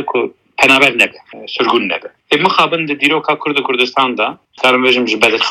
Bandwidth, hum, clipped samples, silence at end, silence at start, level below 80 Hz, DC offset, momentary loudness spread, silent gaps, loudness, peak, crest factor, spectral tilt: 16.5 kHz; none; under 0.1%; 0 s; 0 s; -58 dBFS; under 0.1%; 10 LU; none; -12 LUFS; 0 dBFS; 14 dB; -3.5 dB/octave